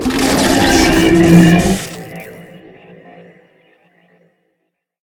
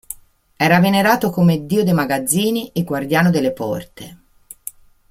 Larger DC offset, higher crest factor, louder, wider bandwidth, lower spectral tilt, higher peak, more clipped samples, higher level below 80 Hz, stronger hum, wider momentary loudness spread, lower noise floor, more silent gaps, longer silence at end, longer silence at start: neither; about the same, 14 dB vs 18 dB; first, -10 LUFS vs -17 LUFS; first, 18 kHz vs 16 kHz; about the same, -5 dB/octave vs -5.5 dB/octave; about the same, 0 dBFS vs 0 dBFS; first, 0.1% vs under 0.1%; first, -32 dBFS vs -52 dBFS; neither; first, 23 LU vs 20 LU; first, -70 dBFS vs -38 dBFS; neither; first, 2.6 s vs 0.4 s; about the same, 0 s vs 0.1 s